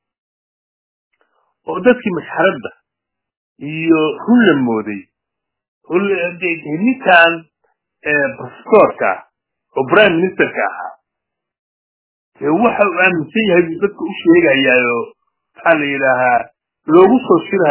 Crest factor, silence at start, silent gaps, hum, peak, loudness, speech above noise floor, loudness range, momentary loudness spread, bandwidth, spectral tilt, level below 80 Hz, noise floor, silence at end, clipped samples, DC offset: 16 dB; 1.7 s; 3.37-3.56 s, 5.68-5.81 s, 11.59-12.32 s; none; 0 dBFS; -13 LUFS; 67 dB; 4 LU; 16 LU; 4 kHz; -9.5 dB/octave; -58 dBFS; -80 dBFS; 0 s; under 0.1%; under 0.1%